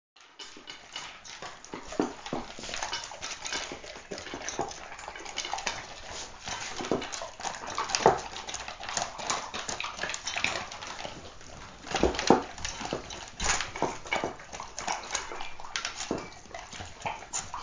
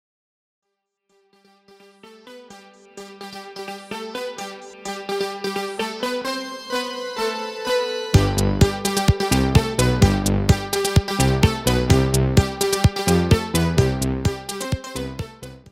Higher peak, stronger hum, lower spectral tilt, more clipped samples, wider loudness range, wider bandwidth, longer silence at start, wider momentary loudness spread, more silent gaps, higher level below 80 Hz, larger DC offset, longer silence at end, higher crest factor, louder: about the same, -2 dBFS vs -2 dBFS; neither; second, -2.5 dB/octave vs -5 dB/octave; neither; second, 6 LU vs 16 LU; second, 7.8 kHz vs 16 kHz; second, 0.15 s vs 2.05 s; about the same, 14 LU vs 16 LU; neither; second, -52 dBFS vs -32 dBFS; neither; about the same, 0 s vs 0 s; first, 32 dB vs 20 dB; second, -33 LUFS vs -21 LUFS